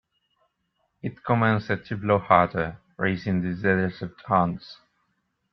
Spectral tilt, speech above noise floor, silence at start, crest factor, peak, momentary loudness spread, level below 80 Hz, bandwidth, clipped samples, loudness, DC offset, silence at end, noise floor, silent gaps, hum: -9 dB/octave; 50 dB; 1.05 s; 24 dB; -2 dBFS; 15 LU; -58 dBFS; 6 kHz; under 0.1%; -24 LUFS; under 0.1%; 0.8 s; -74 dBFS; none; none